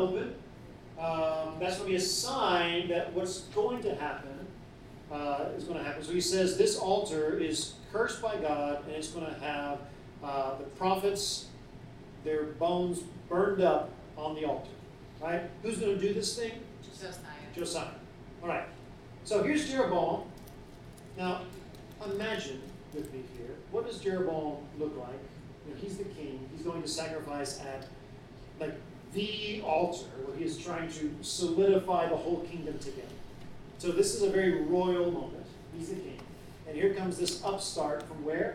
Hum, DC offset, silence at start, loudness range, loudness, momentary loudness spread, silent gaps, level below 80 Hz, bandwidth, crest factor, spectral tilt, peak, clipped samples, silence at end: none; under 0.1%; 0 s; 7 LU; -33 LUFS; 20 LU; none; -56 dBFS; 16 kHz; 22 dB; -4 dB/octave; -12 dBFS; under 0.1%; 0 s